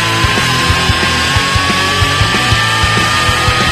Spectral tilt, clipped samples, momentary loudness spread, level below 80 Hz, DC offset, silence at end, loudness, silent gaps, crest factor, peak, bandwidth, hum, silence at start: -3 dB/octave; under 0.1%; 1 LU; -24 dBFS; under 0.1%; 0 s; -10 LUFS; none; 12 dB; 0 dBFS; 14.5 kHz; none; 0 s